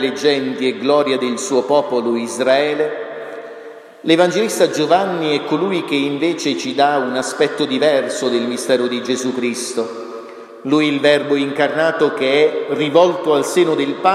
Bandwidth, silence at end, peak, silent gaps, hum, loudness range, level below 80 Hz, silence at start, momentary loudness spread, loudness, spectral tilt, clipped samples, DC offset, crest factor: 14 kHz; 0 s; 0 dBFS; none; none; 3 LU; -70 dBFS; 0 s; 12 LU; -17 LUFS; -4 dB/octave; under 0.1%; under 0.1%; 16 dB